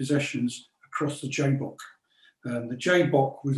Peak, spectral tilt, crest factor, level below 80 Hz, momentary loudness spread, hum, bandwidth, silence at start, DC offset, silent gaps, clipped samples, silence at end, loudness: -8 dBFS; -6 dB/octave; 20 dB; -70 dBFS; 19 LU; none; 12.5 kHz; 0 s; under 0.1%; none; under 0.1%; 0 s; -27 LUFS